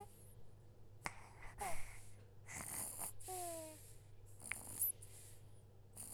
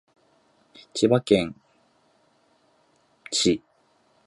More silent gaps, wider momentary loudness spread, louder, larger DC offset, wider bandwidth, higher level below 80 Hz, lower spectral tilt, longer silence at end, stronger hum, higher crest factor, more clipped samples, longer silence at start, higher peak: neither; first, 22 LU vs 12 LU; second, -47 LUFS vs -23 LUFS; neither; first, over 20 kHz vs 11.5 kHz; about the same, -62 dBFS vs -58 dBFS; second, -2.5 dB/octave vs -4.5 dB/octave; second, 0 s vs 0.7 s; neither; about the same, 28 dB vs 24 dB; neither; second, 0 s vs 0.95 s; second, -20 dBFS vs -4 dBFS